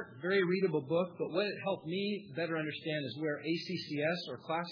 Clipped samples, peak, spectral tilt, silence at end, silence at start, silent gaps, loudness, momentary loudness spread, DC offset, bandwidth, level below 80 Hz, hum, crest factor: under 0.1%; -18 dBFS; -4 dB/octave; 0 s; 0 s; none; -35 LUFS; 6 LU; under 0.1%; 5.4 kHz; -84 dBFS; none; 16 dB